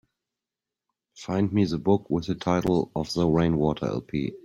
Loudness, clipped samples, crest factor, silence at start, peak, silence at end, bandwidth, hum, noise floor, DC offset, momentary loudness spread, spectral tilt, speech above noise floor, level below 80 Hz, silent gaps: -25 LUFS; under 0.1%; 18 dB; 1.15 s; -8 dBFS; 0.1 s; 12.5 kHz; none; -89 dBFS; under 0.1%; 7 LU; -7.5 dB/octave; 65 dB; -50 dBFS; none